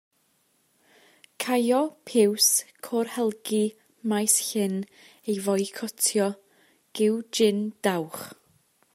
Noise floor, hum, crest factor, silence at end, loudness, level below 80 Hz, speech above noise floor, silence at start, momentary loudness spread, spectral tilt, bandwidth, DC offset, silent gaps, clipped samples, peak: -68 dBFS; none; 20 dB; 0.6 s; -25 LUFS; -78 dBFS; 43 dB; 1.4 s; 14 LU; -3 dB/octave; 16 kHz; under 0.1%; none; under 0.1%; -8 dBFS